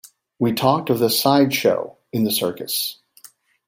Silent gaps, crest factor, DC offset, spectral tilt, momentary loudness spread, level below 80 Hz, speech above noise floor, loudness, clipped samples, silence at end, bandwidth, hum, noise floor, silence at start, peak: none; 18 dB; under 0.1%; -4.5 dB/octave; 8 LU; -62 dBFS; 30 dB; -20 LUFS; under 0.1%; 0.75 s; 16.5 kHz; none; -49 dBFS; 0.4 s; -2 dBFS